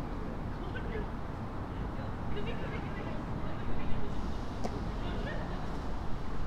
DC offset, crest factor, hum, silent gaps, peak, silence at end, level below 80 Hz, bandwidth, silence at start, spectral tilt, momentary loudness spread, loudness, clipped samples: under 0.1%; 16 dB; none; none; -16 dBFS; 0 s; -40 dBFS; 8.6 kHz; 0 s; -7 dB/octave; 2 LU; -39 LUFS; under 0.1%